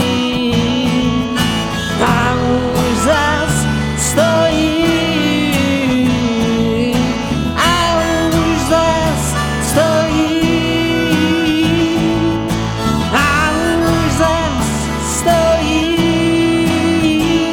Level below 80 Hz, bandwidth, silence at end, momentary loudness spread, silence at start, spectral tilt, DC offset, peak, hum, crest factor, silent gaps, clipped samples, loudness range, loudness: -28 dBFS; 18 kHz; 0 s; 4 LU; 0 s; -4.5 dB/octave; under 0.1%; 0 dBFS; none; 14 dB; none; under 0.1%; 1 LU; -14 LUFS